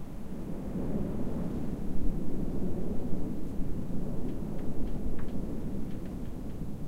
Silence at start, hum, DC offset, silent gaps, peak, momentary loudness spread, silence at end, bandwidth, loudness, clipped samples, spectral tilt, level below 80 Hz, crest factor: 0 s; none; under 0.1%; none; -14 dBFS; 5 LU; 0 s; 4 kHz; -37 LUFS; under 0.1%; -9 dB/octave; -38 dBFS; 14 dB